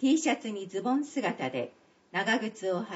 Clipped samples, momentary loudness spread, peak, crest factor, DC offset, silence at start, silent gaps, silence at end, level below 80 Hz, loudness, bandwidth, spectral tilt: under 0.1%; 8 LU; -14 dBFS; 16 dB; under 0.1%; 0 s; none; 0 s; -82 dBFS; -31 LUFS; 8 kHz; -3 dB/octave